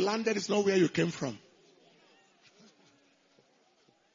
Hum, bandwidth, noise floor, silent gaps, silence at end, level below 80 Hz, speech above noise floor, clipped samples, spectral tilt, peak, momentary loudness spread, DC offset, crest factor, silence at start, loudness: none; 7.6 kHz; -68 dBFS; none; 2.8 s; -78 dBFS; 39 dB; under 0.1%; -5 dB/octave; -16 dBFS; 12 LU; under 0.1%; 18 dB; 0 s; -30 LUFS